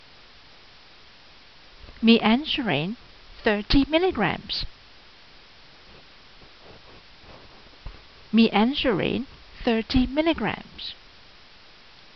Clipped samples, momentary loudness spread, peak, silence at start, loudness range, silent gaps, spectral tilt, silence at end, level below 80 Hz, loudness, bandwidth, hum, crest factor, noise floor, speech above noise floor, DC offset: under 0.1%; 21 LU; -4 dBFS; 1.9 s; 7 LU; none; -3.5 dB/octave; 1.25 s; -42 dBFS; -23 LUFS; 6.2 kHz; none; 22 dB; -51 dBFS; 29 dB; 0.2%